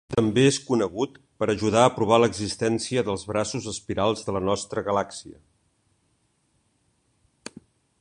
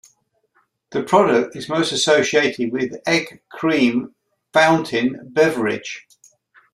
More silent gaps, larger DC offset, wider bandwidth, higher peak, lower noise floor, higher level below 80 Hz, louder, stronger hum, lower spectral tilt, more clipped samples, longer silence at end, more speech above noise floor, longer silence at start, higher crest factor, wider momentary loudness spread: neither; neither; second, 11.5 kHz vs 14.5 kHz; about the same, -2 dBFS vs -2 dBFS; first, -69 dBFS vs -64 dBFS; first, -54 dBFS vs -62 dBFS; second, -24 LUFS vs -18 LUFS; neither; about the same, -5 dB/octave vs -4 dB/octave; neither; first, 2.7 s vs 0.75 s; about the same, 45 dB vs 46 dB; second, 0.1 s vs 0.9 s; about the same, 22 dB vs 18 dB; about the same, 13 LU vs 12 LU